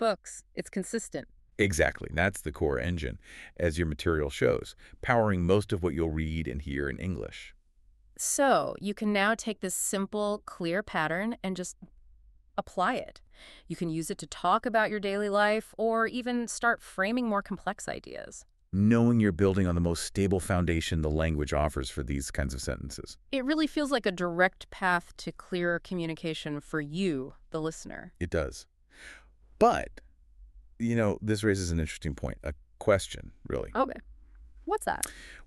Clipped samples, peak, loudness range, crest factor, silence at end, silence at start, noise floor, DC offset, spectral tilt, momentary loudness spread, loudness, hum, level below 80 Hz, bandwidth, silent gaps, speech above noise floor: under 0.1%; -10 dBFS; 5 LU; 20 dB; 0 s; 0 s; -61 dBFS; under 0.1%; -5 dB/octave; 14 LU; -30 LUFS; none; -44 dBFS; 13.5 kHz; none; 32 dB